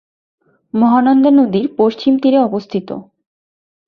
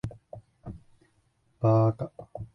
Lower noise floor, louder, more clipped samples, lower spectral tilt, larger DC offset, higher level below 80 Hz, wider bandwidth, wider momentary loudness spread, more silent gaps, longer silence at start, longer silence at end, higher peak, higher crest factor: first, under -90 dBFS vs -69 dBFS; first, -13 LUFS vs -26 LUFS; neither; second, -8.5 dB/octave vs -11 dB/octave; neither; about the same, -60 dBFS vs -56 dBFS; about the same, 5.6 kHz vs 6 kHz; second, 13 LU vs 25 LU; neither; first, 0.75 s vs 0.05 s; first, 0.85 s vs 0.1 s; first, -2 dBFS vs -12 dBFS; second, 12 dB vs 18 dB